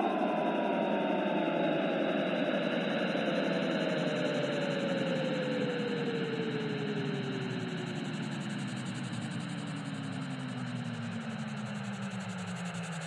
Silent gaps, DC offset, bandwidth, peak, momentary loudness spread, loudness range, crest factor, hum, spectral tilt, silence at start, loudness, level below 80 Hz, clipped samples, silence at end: none; under 0.1%; 11.5 kHz; -18 dBFS; 7 LU; 7 LU; 16 dB; none; -6 dB/octave; 0 s; -34 LUFS; -78 dBFS; under 0.1%; 0 s